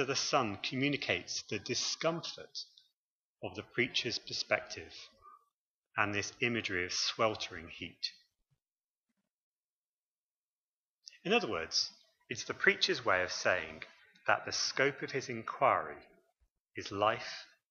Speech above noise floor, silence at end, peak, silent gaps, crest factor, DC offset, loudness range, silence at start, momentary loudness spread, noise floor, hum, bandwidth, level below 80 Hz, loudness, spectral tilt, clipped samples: over 55 dB; 0.25 s; -12 dBFS; 2.93-3.36 s, 5.54-5.82 s, 8.72-8.76 s, 8.84-9.04 s, 9.30-11.02 s, 16.60-16.65 s; 24 dB; under 0.1%; 7 LU; 0 s; 15 LU; under -90 dBFS; none; 7.6 kHz; -72 dBFS; -34 LUFS; -2.5 dB/octave; under 0.1%